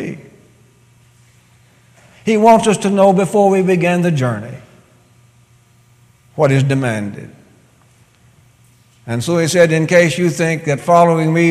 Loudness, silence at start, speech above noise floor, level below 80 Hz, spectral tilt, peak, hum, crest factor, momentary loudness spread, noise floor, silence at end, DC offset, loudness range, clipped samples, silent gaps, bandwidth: -13 LUFS; 0 s; 38 dB; -56 dBFS; -6 dB/octave; 0 dBFS; none; 16 dB; 15 LU; -50 dBFS; 0 s; under 0.1%; 7 LU; under 0.1%; none; 15 kHz